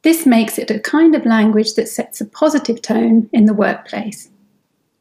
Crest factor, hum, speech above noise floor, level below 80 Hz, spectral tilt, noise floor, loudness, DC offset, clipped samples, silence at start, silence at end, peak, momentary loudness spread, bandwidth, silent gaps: 14 dB; none; 49 dB; -64 dBFS; -5 dB/octave; -63 dBFS; -15 LUFS; under 0.1%; under 0.1%; 0.05 s; 0.8 s; -2 dBFS; 13 LU; 16 kHz; none